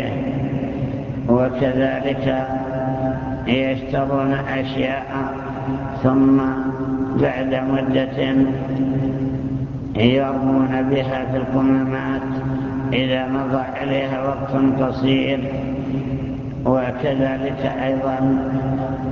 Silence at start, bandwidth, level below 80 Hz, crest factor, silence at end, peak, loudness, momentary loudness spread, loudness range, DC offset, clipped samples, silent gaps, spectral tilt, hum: 0 s; 6.4 kHz; -40 dBFS; 20 dB; 0 s; 0 dBFS; -20 LUFS; 7 LU; 2 LU; under 0.1%; under 0.1%; none; -8.5 dB/octave; none